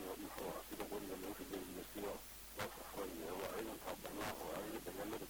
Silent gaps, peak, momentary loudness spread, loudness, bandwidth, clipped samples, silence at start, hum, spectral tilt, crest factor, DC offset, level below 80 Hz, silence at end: none; -32 dBFS; 3 LU; -47 LUFS; over 20 kHz; under 0.1%; 0 s; none; -3.5 dB/octave; 16 dB; under 0.1%; -64 dBFS; 0 s